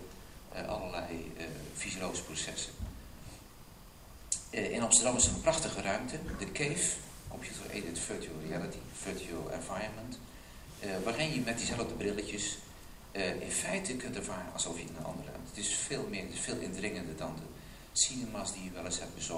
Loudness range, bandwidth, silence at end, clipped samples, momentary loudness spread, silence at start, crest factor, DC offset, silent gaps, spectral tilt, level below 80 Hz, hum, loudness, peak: 10 LU; 16 kHz; 0 s; under 0.1%; 19 LU; 0 s; 28 dB; under 0.1%; none; -2.5 dB/octave; -52 dBFS; none; -35 LUFS; -8 dBFS